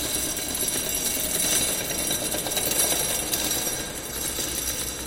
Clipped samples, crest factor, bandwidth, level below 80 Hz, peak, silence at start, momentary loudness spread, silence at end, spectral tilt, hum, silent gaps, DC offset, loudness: under 0.1%; 20 dB; 17 kHz; -44 dBFS; -8 dBFS; 0 s; 6 LU; 0 s; -1 dB/octave; none; none; under 0.1%; -24 LUFS